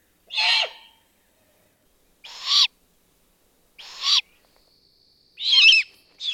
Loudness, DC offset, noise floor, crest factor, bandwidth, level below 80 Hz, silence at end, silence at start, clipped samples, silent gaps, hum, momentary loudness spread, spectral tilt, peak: -18 LUFS; under 0.1%; -63 dBFS; 20 dB; 17.5 kHz; -72 dBFS; 0 s; 0.3 s; under 0.1%; none; none; 19 LU; 4 dB/octave; -4 dBFS